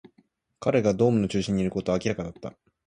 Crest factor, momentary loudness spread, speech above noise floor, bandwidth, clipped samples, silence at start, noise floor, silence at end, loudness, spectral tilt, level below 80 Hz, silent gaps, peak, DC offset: 18 dB; 14 LU; 41 dB; 10.5 kHz; under 0.1%; 0.6 s; -65 dBFS; 0.35 s; -25 LUFS; -6.5 dB/octave; -52 dBFS; none; -8 dBFS; under 0.1%